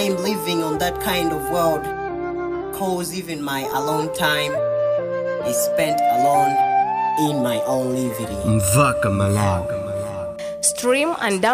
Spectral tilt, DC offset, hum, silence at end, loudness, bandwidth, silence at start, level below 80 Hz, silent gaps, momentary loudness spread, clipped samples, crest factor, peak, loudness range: -4.5 dB/octave; under 0.1%; none; 0 s; -20 LUFS; 16 kHz; 0 s; -46 dBFS; none; 9 LU; under 0.1%; 16 dB; -4 dBFS; 4 LU